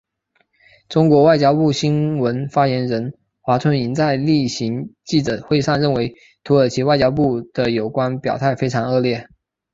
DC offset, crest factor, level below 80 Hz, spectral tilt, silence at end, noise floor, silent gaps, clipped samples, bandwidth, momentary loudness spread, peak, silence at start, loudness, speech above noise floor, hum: under 0.1%; 16 dB; -50 dBFS; -6.5 dB/octave; 0.5 s; -65 dBFS; none; under 0.1%; 7.8 kHz; 8 LU; -2 dBFS; 0.9 s; -18 LUFS; 48 dB; none